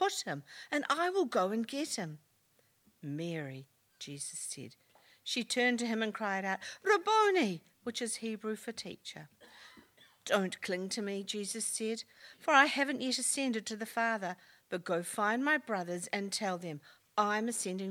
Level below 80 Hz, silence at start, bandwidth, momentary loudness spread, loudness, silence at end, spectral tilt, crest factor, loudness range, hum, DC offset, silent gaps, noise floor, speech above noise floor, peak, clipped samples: -84 dBFS; 0 s; 19 kHz; 17 LU; -34 LUFS; 0 s; -3 dB/octave; 26 dB; 7 LU; none; under 0.1%; none; -72 dBFS; 37 dB; -10 dBFS; under 0.1%